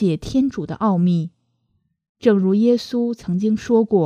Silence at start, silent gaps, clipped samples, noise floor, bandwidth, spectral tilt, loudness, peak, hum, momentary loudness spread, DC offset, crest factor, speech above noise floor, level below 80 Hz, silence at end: 0 s; 2.09-2.15 s; under 0.1%; -68 dBFS; 9.8 kHz; -8 dB/octave; -19 LUFS; -2 dBFS; none; 7 LU; under 0.1%; 18 dB; 50 dB; -50 dBFS; 0 s